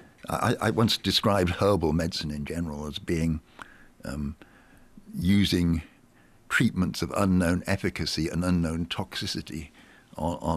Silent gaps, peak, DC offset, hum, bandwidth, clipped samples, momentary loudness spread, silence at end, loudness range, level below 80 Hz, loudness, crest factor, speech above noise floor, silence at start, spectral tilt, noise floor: none; -12 dBFS; under 0.1%; none; 15 kHz; under 0.1%; 14 LU; 0 s; 4 LU; -48 dBFS; -27 LUFS; 16 dB; 31 dB; 0.25 s; -5.5 dB/octave; -57 dBFS